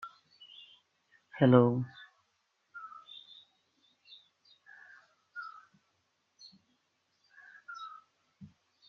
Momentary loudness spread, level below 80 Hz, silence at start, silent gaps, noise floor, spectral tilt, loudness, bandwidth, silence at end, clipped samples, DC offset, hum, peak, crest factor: 31 LU; -76 dBFS; 0.05 s; none; -78 dBFS; -7 dB/octave; -28 LUFS; 6.4 kHz; 0.45 s; under 0.1%; under 0.1%; none; -8 dBFS; 30 dB